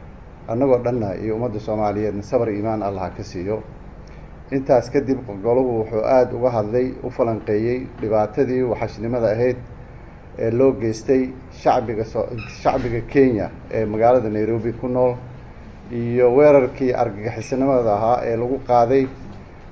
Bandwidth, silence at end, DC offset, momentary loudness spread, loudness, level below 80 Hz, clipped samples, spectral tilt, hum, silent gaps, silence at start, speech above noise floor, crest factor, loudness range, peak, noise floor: 8 kHz; 0 s; 0.3%; 12 LU; -20 LUFS; -42 dBFS; under 0.1%; -8 dB/octave; none; none; 0 s; 20 dB; 18 dB; 5 LU; -2 dBFS; -39 dBFS